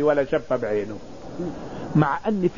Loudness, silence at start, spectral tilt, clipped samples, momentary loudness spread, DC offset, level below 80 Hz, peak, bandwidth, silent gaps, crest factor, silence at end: -25 LUFS; 0 s; -8 dB/octave; under 0.1%; 14 LU; 0.9%; -50 dBFS; -4 dBFS; 7.4 kHz; none; 20 dB; 0 s